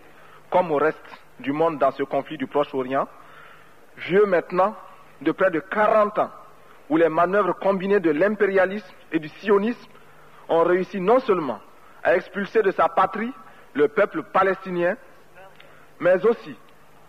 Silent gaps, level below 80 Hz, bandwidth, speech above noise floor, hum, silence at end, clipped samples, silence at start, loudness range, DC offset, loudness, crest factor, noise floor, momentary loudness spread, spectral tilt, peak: none; -66 dBFS; 11 kHz; 29 dB; none; 0.55 s; under 0.1%; 0.5 s; 3 LU; 0.3%; -22 LUFS; 16 dB; -50 dBFS; 10 LU; -7.5 dB/octave; -8 dBFS